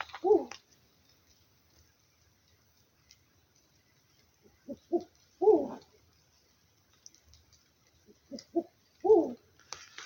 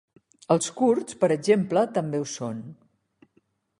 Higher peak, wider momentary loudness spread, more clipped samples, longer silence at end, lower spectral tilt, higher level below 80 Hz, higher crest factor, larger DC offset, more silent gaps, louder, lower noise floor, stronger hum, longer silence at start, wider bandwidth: second, -12 dBFS vs -6 dBFS; first, 24 LU vs 12 LU; neither; second, 0 s vs 1.05 s; about the same, -5 dB/octave vs -5.5 dB/octave; second, -74 dBFS vs -68 dBFS; about the same, 22 dB vs 20 dB; neither; neither; second, -29 LUFS vs -24 LUFS; about the same, -68 dBFS vs -68 dBFS; neither; second, 0 s vs 0.5 s; first, 16.5 kHz vs 11.5 kHz